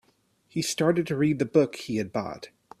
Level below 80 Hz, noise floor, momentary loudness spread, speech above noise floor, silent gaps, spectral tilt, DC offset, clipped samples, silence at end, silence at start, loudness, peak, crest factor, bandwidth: -64 dBFS; -67 dBFS; 14 LU; 41 dB; none; -5.5 dB/octave; under 0.1%; under 0.1%; 0.35 s; 0.55 s; -26 LUFS; -8 dBFS; 20 dB; 15 kHz